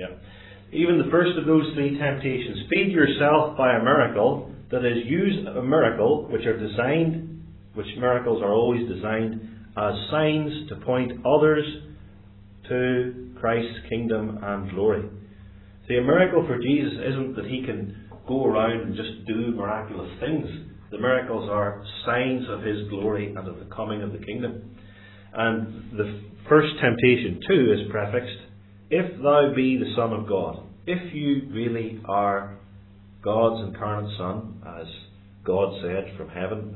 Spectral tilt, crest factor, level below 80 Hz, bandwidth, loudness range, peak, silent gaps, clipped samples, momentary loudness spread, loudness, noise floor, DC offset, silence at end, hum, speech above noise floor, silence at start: -10.5 dB/octave; 22 dB; -52 dBFS; 4.2 kHz; 7 LU; -4 dBFS; none; under 0.1%; 15 LU; -24 LUFS; -48 dBFS; under 0.1%; 0 s; none; 24 dB; 0 s